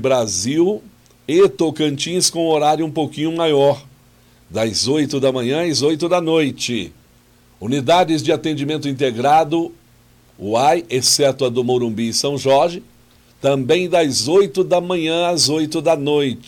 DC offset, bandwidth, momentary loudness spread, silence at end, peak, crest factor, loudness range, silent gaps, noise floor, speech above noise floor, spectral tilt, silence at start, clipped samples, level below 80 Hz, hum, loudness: under 0.1%; 17.5 kHz; 7 LU; 0.05 s; -4 dBFS; 14 dB; 2 LU; none; -51 dBFS; 35 dB; -4 dB/octave; 0 s; under 0.1%; -56 dBFS; none; -17 LUFS